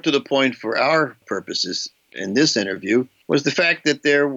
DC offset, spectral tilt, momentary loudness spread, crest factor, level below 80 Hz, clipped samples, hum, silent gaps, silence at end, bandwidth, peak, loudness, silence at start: under 0.1%; -3.5 dB/octave; 8 LU; 14 dB; -74 dBFS; under 0.1%; none; none; 0 s; 8 kHz; -6 dBFS; -20 LUFS; 0.05 s